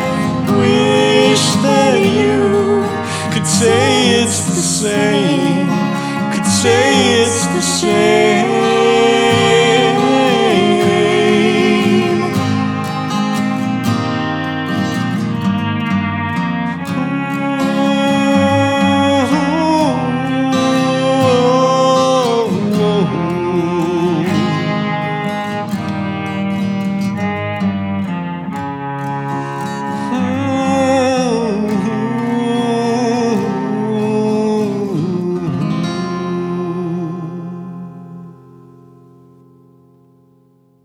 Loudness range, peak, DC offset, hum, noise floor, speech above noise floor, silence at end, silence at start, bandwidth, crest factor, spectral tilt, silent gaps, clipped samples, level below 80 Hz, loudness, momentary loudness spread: 8 LU; 0 dBFS; under 0.1%; none; -52 dBFS; 39 dB; 2.55 s; 0 s; 16.5 kHz; 14 dB; -5 dB/octave; none; under 0.1%; -52 dBFS; -14 LUFS; 9 LU